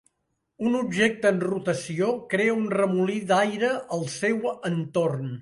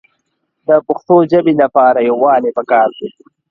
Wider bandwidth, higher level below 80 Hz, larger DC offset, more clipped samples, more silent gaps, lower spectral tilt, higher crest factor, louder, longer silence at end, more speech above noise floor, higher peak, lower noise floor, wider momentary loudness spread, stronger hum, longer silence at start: first, 11.5 kHz vs 5.6 kHz; second, -68 dBFS vs -60 dBFS; neither; neither; neither; second, -5.5 dB/octave vs -9 dB/octave; first, 18 dB vs 12 dB; second, -25 LUFS vs -12 LUFS; second, 0 s vs 0.4 s; second, 52 dB vs 56 dB; second, -6 dBFS vs 0 dBFS; first, -77 dBFS vs -68 dBFS; second, 6 LU vs 10 LU; neither; about the same, 0.6 s vs 0.7 s